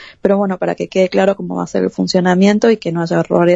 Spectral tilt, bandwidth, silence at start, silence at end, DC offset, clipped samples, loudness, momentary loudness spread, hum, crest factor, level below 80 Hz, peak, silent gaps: -6.5 dB/octave; 8 kHz; 0 s; 0 s; under 0.1%; under 0.1%; -15 LUFS; 7 LU; none; 14 dB; -54 dBFS; 0 dBFS; none